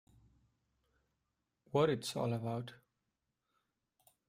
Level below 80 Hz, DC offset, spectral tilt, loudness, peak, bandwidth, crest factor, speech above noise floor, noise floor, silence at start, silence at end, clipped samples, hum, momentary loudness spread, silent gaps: -76 dBFS; under 0.1%; -6 dB/octave; -37 LUFS; -18 dBFS; 16 kHz; 24 dB; 51 dB; -87 dBFS; 1.75 s; 1.55 s; under 0.1%; none; 11 LU; none